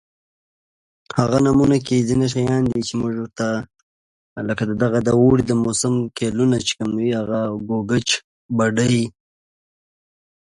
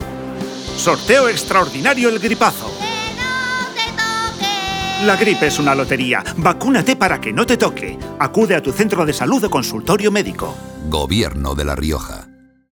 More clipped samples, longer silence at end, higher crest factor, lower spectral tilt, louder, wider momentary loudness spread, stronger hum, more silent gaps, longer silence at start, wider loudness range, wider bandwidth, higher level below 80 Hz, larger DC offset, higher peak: neither; first, 1.35 s vs 0.4 s; about the same, 20 dB vs 16 dB; first, -5.5 dB/octave vs -4 dB/octave; second, -19 LUFS vs -16 LUFS; about the same, 9 LU vs 11 LU; neither; first, 3.83-4.36 s, 8.24-8.49 s vs none; first, 1.15 s vs 0 s; about the same, 3 LU vs 3 LU; second, 11.5 kHz vs over 20 kHz; second, -48 dBFS vs -36 dBFS; neither; about the same, 0 dBFS vs 0 dBFS